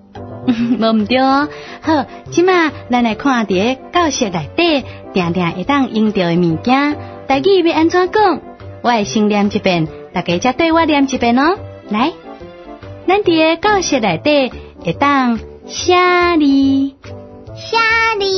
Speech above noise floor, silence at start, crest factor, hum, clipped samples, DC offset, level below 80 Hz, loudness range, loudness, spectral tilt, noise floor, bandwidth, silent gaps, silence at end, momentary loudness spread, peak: 19 dB; 0.15 s; 14 dB; none; under 0.1%; under 0.1%; -44 dBFS; 2 LU; -14 LUFS; -5 dB/octave; -33 dBFS; 6.4 kHz; none; 0 s; 12 LU; 0 dBFS